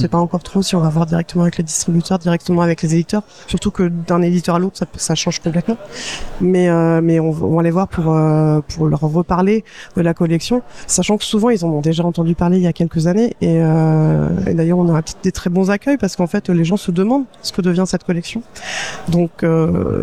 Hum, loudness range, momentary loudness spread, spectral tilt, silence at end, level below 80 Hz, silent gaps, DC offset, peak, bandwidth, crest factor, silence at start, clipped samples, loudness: none; 3 LU; 7 LU; -6 dB/octave; 0 s; -40 dBFS; none; 0.7%; -2 dBFS; 13 kHz; 14 dB; 0 s; under 0.1%; -16 LUFS